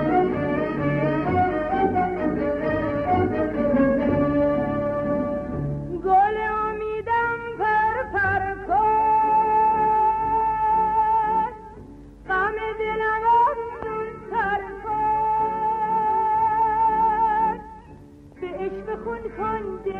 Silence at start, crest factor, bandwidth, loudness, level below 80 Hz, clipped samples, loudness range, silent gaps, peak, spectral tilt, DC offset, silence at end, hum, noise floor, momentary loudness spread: 0 s; 14 dB; 5.4 kHz; -22 LUFS; -44 dBFS; under 0.1%; 3 LU; none; -8 dBFS; -8.5 dB/octave; under 0.1%; 0 s; none; -45 dBFS; 10 LU